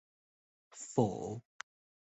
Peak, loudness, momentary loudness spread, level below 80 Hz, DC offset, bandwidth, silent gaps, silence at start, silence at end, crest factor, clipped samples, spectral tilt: -14 dBFS; -37 LUFS; 19 LU; -70 dBFS; under 0.1%; 8.2 kHz; none; 0.7 s; 0.75 s; 26 dB; under 0.1%; -6.5 dB/octave